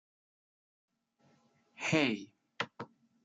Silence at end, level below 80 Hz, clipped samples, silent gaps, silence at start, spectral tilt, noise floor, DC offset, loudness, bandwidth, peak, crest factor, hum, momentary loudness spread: 0.4 s; -82 dBFS; under 0.1%; none; 1.8 s; -4.5 dB/octave; -71 dBFS; under 0.1%; -34 LUFS; 9.4 kHz; -16 dBFS; 24 dB; none; 20 LU